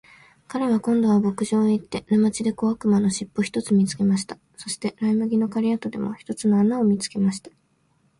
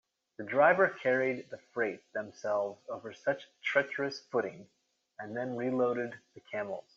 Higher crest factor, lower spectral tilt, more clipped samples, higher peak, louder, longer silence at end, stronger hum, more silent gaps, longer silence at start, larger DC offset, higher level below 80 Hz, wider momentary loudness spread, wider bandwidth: second, 14 dB vs 20 dB; first, -6 dB/octave vs -3.5 dB/octave; neither; about the same, -10 dBFS vs -12 dBFS; first, -22 LUFS vs -32 LUFS; first, 0.7 s vs 0.15 s; neither; neither; about the same, 0.5 s vs 0.4 s; neither; first, -60 dBFS vs -82 dBFS; second, 9 LU vs 15 LU; first, 11.5 kHz vs 7.4 kHz